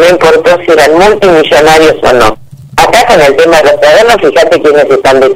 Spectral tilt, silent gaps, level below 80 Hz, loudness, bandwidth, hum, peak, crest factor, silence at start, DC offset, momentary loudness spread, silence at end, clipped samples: -3.5 dB/octave; none; -30 dBFS; -4 LUFS; 16.5 kHz; none; 0 dBFS; 4 dB; 0 s; 0.7%; 3 LU; 0 s; 4%